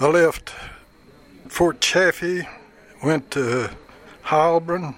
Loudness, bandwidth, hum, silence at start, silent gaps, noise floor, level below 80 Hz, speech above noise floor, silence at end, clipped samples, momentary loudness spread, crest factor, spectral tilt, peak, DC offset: -20 LUFS; 16.5 kHz; none; 0 s; none; -50 dBFS; -50 dBFS; 30 dB; 0.05 s; under 0.1%; 18 LU; 18 dB; -4 dB/octave; -4 dBFS; under 0.1%